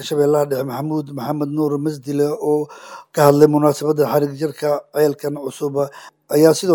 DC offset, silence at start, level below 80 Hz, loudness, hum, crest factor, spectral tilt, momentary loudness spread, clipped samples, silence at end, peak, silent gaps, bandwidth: under 0.1%; 0 s; -66 dBFS; -18 LUFS; none; 18 dB; -6 dB/octave; 12 LU; under 0.1%; 0 s; 0 dBFS; none; 19.5 kHz